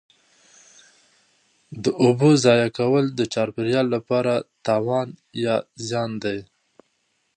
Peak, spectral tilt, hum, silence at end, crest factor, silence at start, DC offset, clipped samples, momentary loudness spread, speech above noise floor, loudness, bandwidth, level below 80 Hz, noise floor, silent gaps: -2 dBFS; -6 dB/octave; none; 0.95 s; 20 dB; 1.7 s; under 0.1%; under 0.1%; 12 LU; 49 dB; -21 LUFS; 10 kHz; -64 dBFS; -70 dBFS; none